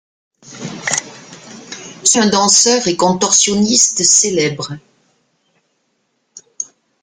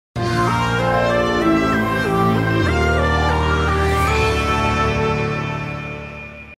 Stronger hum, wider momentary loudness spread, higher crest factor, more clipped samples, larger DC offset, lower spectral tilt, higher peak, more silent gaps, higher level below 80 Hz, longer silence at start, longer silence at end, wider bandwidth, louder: neither; first, 21 LU vs 9 LU; about the same, 16 dB vs 14 dB; neither; neither; second, -2 dB/octave vs -6 dB/octave; first, 0 dBFS vs -4 dBFS; neither; second, -56 dBFS vs -28 dBFS; first, 0.5 s vs 0.15 s; first, 0.4 s vs 0.05 s; about the same, 16 kHz vs 15.5 kHz; first, -11 LUFS vs -18 LUFS